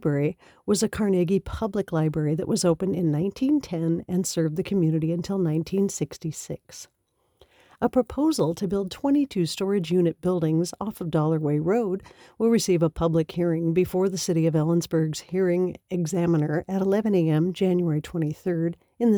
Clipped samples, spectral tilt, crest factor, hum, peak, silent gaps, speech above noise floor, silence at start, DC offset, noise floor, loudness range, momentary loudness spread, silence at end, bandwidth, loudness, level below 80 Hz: under 0.1%; -6.5 dB/octave; 14 dB; none; -10 dBFS; none; 37 dB; 0 s; under 0.1%; -61 dBFS; 4 LU; 7 LU; 0 s; over 20 kHz; -25 LUFS; -52 dBFS